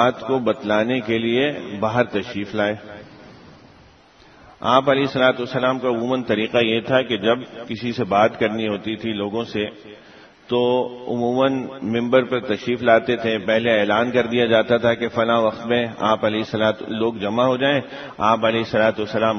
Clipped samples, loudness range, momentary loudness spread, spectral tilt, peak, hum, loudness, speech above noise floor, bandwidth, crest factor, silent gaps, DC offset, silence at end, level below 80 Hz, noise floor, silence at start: under 0.1%; 5 LU; 8 LU; -6.5 dB/octave; 0 dBFS; none; -20 LUFS; 30 dB; 6.6 kHz; 20 dB; none; under 0.1%; 0 s; -58 dBFS; -50 dBFS; 0 s